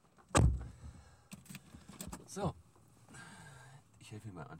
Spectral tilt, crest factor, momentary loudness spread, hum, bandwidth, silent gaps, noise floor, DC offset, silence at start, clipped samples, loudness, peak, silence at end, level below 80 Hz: -5 dB/octave; 26 dB; 26 LU; none; 16 kHz; none; -63 dBFS; under 0.1%; 0.35 s; under 0.1%; -37 LUFS; -14 dBFS; 0 s; -46 dBFS